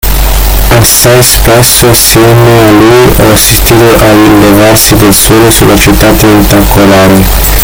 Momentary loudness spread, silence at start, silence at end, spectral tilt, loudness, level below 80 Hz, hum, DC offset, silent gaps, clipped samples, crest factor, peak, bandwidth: 2 LU; 0.05 s; 0 s; -4 dB/octave; -2 LUFS; -12 dBFS; none; under 0.1%; none; 20%; 2 dB; 0 dBFS; over 20 kHz